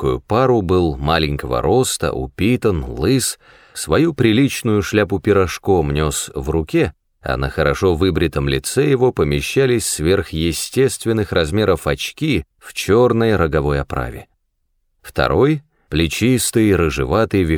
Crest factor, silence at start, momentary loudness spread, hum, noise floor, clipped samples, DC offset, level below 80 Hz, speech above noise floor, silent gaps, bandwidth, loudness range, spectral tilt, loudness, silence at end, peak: 16 dB; 0 s; 8 LU; none; -67 dBFS; under 0.1%; under 0.1%; -32 dBFS; 50 dB; none; over 20 kHz; 2 LU; -5.5 dB/octave; -17 LUFS; 0 s; -2 dBFS